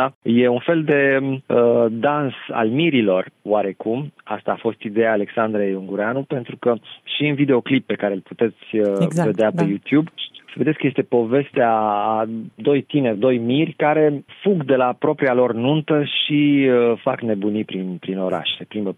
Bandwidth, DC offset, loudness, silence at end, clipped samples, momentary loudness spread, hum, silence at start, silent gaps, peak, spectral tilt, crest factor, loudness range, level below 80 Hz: 10.5 kHz; under 0.1%; -19 LUFS; 0.05 s; under 0.1%; 8 LU; none; 0 s; 0.15-0.21 s; -6 dBFS; -7.5 dB/octave; 14 dB; 3 LU; -70 dBFS